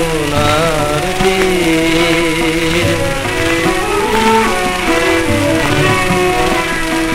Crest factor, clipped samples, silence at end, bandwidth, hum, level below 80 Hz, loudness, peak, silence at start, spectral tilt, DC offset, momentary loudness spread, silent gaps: 12 dB; under 0.1%; 0 s; 16 kHz; none; -26 dBFS; -13 LUFS; 0 dBFS; 0 s; -4.5 dB/octave; under 0.1%; 3 LU; none